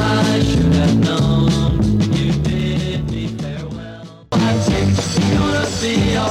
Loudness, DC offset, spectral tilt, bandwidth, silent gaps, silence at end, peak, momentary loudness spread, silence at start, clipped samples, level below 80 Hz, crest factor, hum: -17 LUFS; under 0.1%; -6 dB/octave; 13.5 kHz; none; 0 s; -4 dBFS; 11 LU; 0 s; under 0.1%; -30 dBFS; 12 dB; none